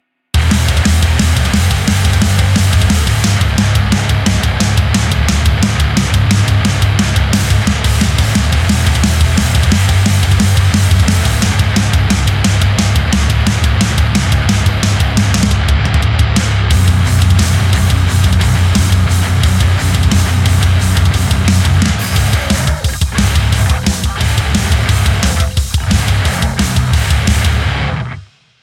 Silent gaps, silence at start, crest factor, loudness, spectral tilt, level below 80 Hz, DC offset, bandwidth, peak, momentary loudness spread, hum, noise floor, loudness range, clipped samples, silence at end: none; 0.35 s; 10 dB; -12 LUFS; -4.5 dB/octave; -18 dBFS; under 0.1%; 16.5 kHz; 0 dBFS; 3 LU; none; -32 dBFS; 2 LU; under 0.1%; 0.4 s